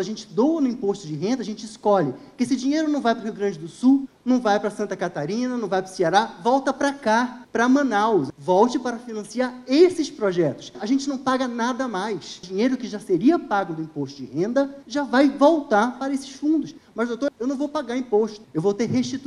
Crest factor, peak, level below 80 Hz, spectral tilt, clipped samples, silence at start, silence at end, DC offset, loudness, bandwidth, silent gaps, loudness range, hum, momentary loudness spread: 18 dB; -4 dBFS; -64 dBFS; -5.5 dB/octave; under 0.1%; 0 s; 0 s; under 0.1%; -23 LUFS; 11.5 kHz; none; 3 LU; none; 9 LU